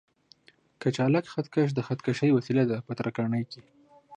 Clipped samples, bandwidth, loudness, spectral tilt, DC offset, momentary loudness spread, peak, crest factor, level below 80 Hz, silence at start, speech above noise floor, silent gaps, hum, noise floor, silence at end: under 0.1%; 9.8 kHz; -28 LUFS; -7.5 dB/octave; under 0.1%; 8 LU; -12 dBFS; 16 dB; -68 dBFS; 0.8 s; 33 dB; none; none; -60 dBFS; 0 s